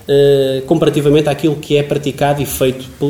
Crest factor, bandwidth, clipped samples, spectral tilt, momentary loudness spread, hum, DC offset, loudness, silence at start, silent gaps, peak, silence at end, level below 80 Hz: 12 dB; 18 kHz; under 0.1%; -6 dB/octave; 6 LU; none; 0.3%; -14 LUFS; 0.1 s; none; 0 dBFS; 0 s; -42 dBFS